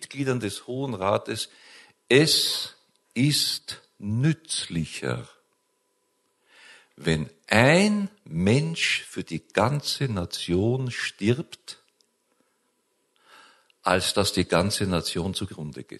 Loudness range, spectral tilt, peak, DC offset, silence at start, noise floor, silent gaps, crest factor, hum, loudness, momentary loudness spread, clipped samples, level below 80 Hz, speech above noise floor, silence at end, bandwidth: 7 LU; -4.5 dB/octave; 0 dBFS; under 0.1%; 0 s; -72 dBFS; none; 26 dB; none; -25 LUFS; 14 LU; under 0.1%; -50 dBFS; 47 dB; 0 s; 12.5 kHz